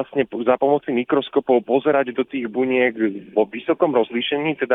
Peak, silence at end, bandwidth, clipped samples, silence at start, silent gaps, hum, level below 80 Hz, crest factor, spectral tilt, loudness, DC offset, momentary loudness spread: -4 dBFS; 0 s; 4 kHz; under 0.1%; 0 s; none; none; -66 dBFS; 16 dB; -8.5 dB/octave; -20 LUFS; under 0.1%; 5 LU